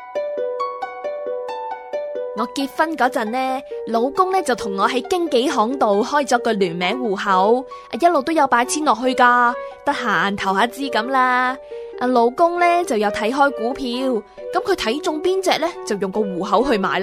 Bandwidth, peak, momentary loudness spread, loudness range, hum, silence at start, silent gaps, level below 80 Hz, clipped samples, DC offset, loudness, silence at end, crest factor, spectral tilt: 15.5 kHz; -2 dBFS; 10 LU; 4 LU; none; 0 s; none; -54 dBFS; under 0.1%; under 0.1%; -19 LUFS; 0 s; 18 dB; -4 dB/octave